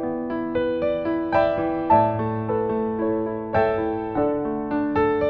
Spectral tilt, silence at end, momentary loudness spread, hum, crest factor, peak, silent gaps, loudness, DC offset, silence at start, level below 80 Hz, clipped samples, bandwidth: -9.5 dB/octave; 0 s; 7 LU; none; 18 dB; -4 dBFS; none; -23 LUFS; under 0.1%; 0 s; -48 dBFS; under 0.1%; 5.2 kHz